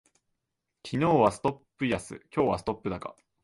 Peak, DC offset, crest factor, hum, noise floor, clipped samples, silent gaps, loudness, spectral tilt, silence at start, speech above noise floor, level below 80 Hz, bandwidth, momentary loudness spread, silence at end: -8 dBFS; under 0.1%; 22 dB; none; -84 dBFS; under 0.1%; none; -29 LUFS; -6.5 dB/octave; 0.85 s; 56 dB; -56 dBFS; 11.5 kHz; 14 LU; 0.3 s